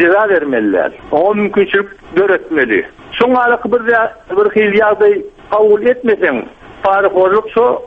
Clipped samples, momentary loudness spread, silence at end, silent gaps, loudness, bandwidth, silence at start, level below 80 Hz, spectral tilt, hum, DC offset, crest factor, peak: under 0.1%; 6 LU; 0 s; none; -12 LUFS; 4.7 kHz; 0 s; -48 dBFS; -7.5 dB/octave; none; under 0.1%; 12 dB; 0 dBFS